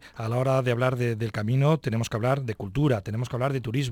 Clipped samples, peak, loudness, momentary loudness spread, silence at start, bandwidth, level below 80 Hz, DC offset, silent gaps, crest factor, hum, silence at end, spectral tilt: under 0.1%; -10 dBFS; -26 LUFS; 6 LU; 0.05 s; 15.5 kHz; -52 dBFS; under 0.1%; none; 14 dB; none; 0 s; -7 dB/octave